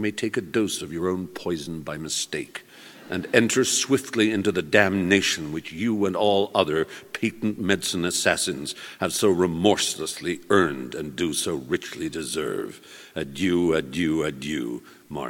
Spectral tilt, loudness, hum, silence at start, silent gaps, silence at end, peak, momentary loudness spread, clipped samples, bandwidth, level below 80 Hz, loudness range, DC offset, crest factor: -3.5 dB/octave; -24 LUFS; none; 0 s; none; 0 s; 0 dBFS; 12 LU; under 0.1%; 17.5 kHz; -56 dBFS; 5 LU; under 0.1%; 24 dB